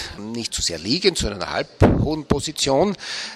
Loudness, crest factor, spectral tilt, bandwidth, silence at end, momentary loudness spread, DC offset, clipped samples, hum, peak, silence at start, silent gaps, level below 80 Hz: -21 LUFS; 22 dB; -4.5 dB/octave; 14.5 kHz; 0 s; 8 LU; under 0.1%; under 0.1%; none; 0 dBFS; 0 s; none; -36 dBFS